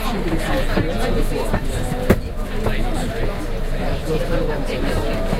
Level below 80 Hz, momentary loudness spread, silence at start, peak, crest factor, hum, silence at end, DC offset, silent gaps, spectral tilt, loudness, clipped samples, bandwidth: -22 dBFS; 5 LU; 0 s; 0 dBFS; 20 dB; none; 0 s; under 0.1%; none; -6 dB/octave; -23 LUFS; under 0.1%; 15.5 kHz